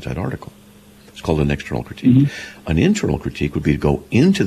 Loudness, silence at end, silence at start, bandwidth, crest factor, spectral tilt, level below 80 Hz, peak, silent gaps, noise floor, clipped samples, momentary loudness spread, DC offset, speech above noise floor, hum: -19 LUFS; 0 s; 0 s; 14 kHz; 14 dB; -7 dB/octave; -34 dBFS; -4 dBFS; none; -45 dBFS; under 0.1%; 12 LU; under 0.1%; 28 dB; none